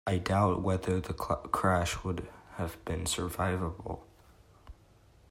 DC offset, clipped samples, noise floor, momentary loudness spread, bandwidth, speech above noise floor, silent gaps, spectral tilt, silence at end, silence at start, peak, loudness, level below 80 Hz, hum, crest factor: under 0.1%; under 0.1%; -60 dBFS; 12 LU; 16 kHz; 29 dB; none; -5.5 dB/octave; 0.6 s; 0.05 s; -14 dBFS; -32 LUFS; -50 dBFS; none; 20 dB